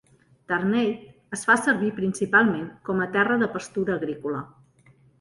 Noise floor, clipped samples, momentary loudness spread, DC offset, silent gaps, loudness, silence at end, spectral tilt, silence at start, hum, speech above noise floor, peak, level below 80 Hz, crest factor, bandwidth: -57 dBFS; under 0.1%; 12 LU; under 0.1%; none; -24 LUFS; 0.75 s; -5.5 dB/octave; 0.5 s; none; 34 dB; -6 dBFS; -62 dBFS; 20 dB; 11.5 kHz